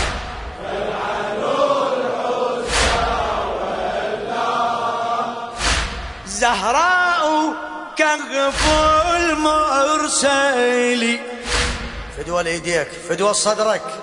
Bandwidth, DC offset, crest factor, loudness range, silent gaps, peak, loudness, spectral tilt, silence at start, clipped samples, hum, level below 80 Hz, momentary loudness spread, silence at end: 11 kHz; under 0.1%; 18 dB; 4 LU; none; -2 dBFS; -19 LUFS; -3 dB/octave; 0 s; under 0.1%; none; -34 dBFS; 10 LU; 0 s